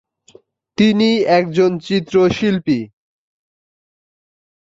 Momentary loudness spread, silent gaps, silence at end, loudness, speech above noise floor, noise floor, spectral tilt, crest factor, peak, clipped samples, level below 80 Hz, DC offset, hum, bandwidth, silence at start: 8 LU; none; 1.85 s; -15 LUFS; 35 dB; -49 dBFS; -6.5 dB/octave; 16 dB; -2 dBFS; under 0.1%; -52 dBFS; under 0.1%; none; 7.8 kHz; 0.8 s